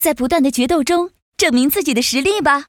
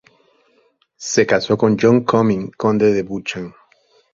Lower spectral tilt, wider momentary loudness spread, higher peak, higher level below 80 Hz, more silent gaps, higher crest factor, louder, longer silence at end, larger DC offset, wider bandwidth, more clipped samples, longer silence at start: second, -2.5 dB/octave vs -5.5 dB/octave; second, 3 LU vs 14 LU; about the same, -2 dBFS vs 0 dBFS; first, -44 dBFS vs -54 dBFS; first, 1.22-1.32 s vs none; about the same, 14 dB vs 18 dB; about the same, -16 LUFS vs -17 LUFS; second, 0.05 s vs 0.65 s; neither; first, over 20 kHz vs 7.6 kHz; neither; second, 0 s vs 1 s